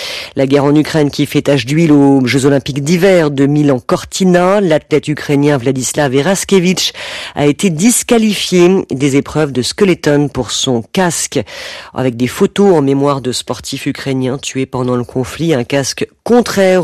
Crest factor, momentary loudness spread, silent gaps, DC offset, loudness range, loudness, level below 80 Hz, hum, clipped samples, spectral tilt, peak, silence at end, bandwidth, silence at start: 10 dB; 9 LU; none; under 0.1%; 4 LU; -12 LUFS; -44 dBFS; none; under 0.1%; -5 dB/octave; 0 dBFS; 0 s; 14 kHz; 0 s